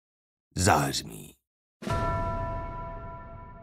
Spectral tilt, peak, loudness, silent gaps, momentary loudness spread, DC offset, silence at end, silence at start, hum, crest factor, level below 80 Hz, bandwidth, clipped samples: -4 dB/octave; -6 dBFS; -29 LUFS; 1.47-1.80 s; 21 LU; under 0.1%; 0 s; 0.55 s; none; 26 dB; -42 dBFS; 16 kHz; under 0.1%